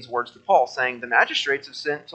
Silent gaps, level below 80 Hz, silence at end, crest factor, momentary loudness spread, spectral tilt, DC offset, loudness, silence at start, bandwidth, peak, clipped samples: none; -76 dBFS; 0 s; 20 dB; 9 LU; -2.5 dB/octave; under 0.1%; -22 LUFS; 0 s; 8.8 kHz; -2 dBFS; under 0.1%